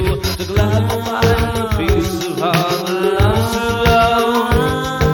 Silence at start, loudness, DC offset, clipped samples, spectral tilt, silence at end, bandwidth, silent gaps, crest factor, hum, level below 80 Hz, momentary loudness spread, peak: 0 s; -16 LUFS; under 0.1%; under 0.1%; -5.5 dB/octave; 0 s; 17.5 kHz; none; 14 dB; none; -24 dBFS; 5 LU; 0 dBFS